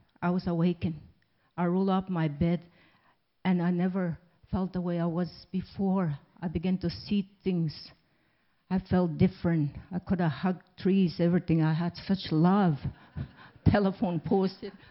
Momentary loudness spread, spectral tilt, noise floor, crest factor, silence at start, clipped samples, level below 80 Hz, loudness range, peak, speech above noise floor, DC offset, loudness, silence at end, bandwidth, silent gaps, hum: 11 LU; -12 dB/octave; -71 dBFS; 20 dB; 0.2 s; under 0.1%; -52 dBFS; 5 LU; -8 dBFS; 43 dB; under 0.1%; -29 LUFS; 0.2 s; 5.8 kHz; none; none